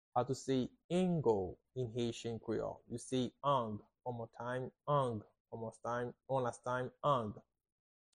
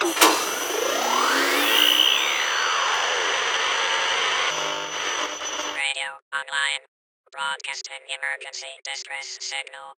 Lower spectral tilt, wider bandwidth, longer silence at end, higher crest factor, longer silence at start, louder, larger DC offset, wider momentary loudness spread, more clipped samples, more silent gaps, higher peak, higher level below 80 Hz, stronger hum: first, -6.5 dB/octave vs 1 dB/octave; second, 10.5 kHz vs over 20 kHz; first, 0.8 s vs 0.05 s; second, 18 dB vs 24 dB; first, 0.15 s vs 0 s; second, -39 LUFS vs -22 LUFS; neither; second, 11 LU vs 14 LU; neither; second, 0.84-0.89 s, 5.40-5.45 s vs 6.22-6.31 s, 6.88-7.24 s; second, -20 dBFS vs -2 dBFS; about the same, -68 dBFS vs -70 dBFS; neither